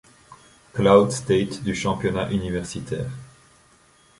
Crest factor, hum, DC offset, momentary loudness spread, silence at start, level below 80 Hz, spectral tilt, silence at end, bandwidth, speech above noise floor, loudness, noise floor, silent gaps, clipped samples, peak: 22 dB; none; under 0.1%; 15 LU; 0.3 s; -48 dBFS; -6 dB/octave; 0.95 s; 11.5 kHz; 35 dB; -22 LUFS; -56 dBFS; none; under 0.1%; -2 dBFS